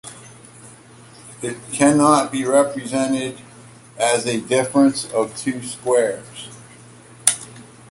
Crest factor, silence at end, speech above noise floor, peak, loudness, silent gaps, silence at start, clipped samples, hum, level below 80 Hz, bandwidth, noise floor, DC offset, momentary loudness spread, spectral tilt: 20 dB; 0.3 s; 26 dB; 0 dBFS; -19 LUFS; none; 0.05 s; under 0.1%; none; -60 dBFS; 16 kHz; -44 dBFS; under 0.1%; 20 LU; -4 dB/octave